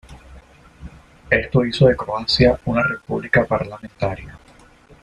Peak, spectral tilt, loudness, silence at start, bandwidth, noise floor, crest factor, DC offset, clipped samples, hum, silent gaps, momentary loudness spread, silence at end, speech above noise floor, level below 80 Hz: -2 dBFS; -6.5 dB/octave; -19 LUFS; 0.1 s; 10.5 kHz; -48 dBFS; 18 dB; under 0.1%; under 0.1%; none; none; 10 LU; 0.65 s; 30 dB; -40 dBFS